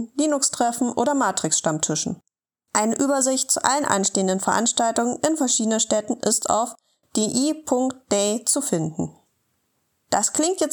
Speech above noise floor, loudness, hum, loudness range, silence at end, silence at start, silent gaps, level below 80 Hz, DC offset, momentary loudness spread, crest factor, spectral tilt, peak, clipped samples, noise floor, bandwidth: 52 dB; -21 LUFS; none; 3 LU; 0 s; 0 s; none; -66 dBFS; under 0.1%; 6 LU; 22 dB; -3 dB/octave; -2 dBFS; under 0.1%; -73 dBFS; 19 kHz